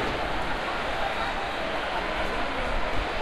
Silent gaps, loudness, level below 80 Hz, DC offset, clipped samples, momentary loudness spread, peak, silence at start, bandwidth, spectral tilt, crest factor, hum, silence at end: none; -29 LUFS; -36 dBFS; under 0.1%; under 0.1%; 1 LU; -14 dBFS; 0 s; 13.5 kHz; -4.5 dB/octave; 14 dB; none; 0 s